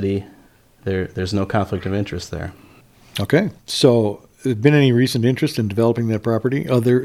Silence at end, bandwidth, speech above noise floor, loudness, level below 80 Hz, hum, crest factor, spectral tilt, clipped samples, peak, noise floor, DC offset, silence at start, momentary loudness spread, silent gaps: 0 s; 15.5 kHz; 33 dB; -19 LUFS; -48 dBFS; none; 18 dB; -6.5 dB/octave; under 0.1%; 0 dBFS; -51 dBFS; under 0.1%; 0 s; 12 LU; none